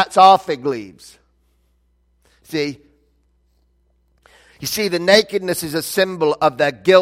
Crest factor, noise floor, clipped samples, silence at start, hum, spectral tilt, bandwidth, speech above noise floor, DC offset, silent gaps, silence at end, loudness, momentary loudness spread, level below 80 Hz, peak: 18 dB; -61 dBFS; under 0.1%; 0 s; none; -3.5 dB/octave; 16.5 kHz; 45 dB; under 0.1%; none; 0 s; -17 LUFS; 15 LU; -58 dBFS; 0 dBFS